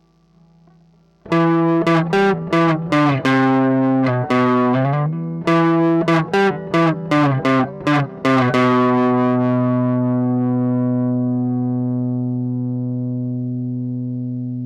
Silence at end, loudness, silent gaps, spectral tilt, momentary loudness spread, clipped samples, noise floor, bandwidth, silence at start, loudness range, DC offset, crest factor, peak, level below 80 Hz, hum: 0 s; -17 LUFS; none; -8 dB/octave; 8 LU; under 0.1%; -53 dBFS; 9 kHz; 1.25 s; 4 LU; under 0.1%; 10 dB; -8 dBFS; -56 dBFS; none